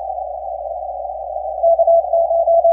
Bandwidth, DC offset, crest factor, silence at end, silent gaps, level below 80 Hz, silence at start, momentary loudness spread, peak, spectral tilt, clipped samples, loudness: 0.9 kHz; under 0.1%; 12 dB; 0 s; none; -48 dBFS; 0 s; 13 LU; -6 dBFS; -9.5 dB/octave; under 0.1%; -17 LUFS